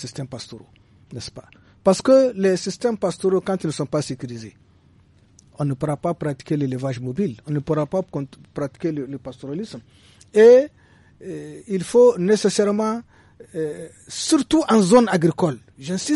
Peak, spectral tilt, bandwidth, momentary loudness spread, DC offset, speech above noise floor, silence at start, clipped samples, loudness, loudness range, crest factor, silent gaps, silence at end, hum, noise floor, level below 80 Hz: -4 dBFS; -5.5 dB/octave; 11.5 kHz; 20 LU; under 0.1%; 34 dB; 0 s; under 0.1%; -20 LUFS; 9 LU; 18 dB; none; 0 s; none; -54 dBFS; -56 dBFS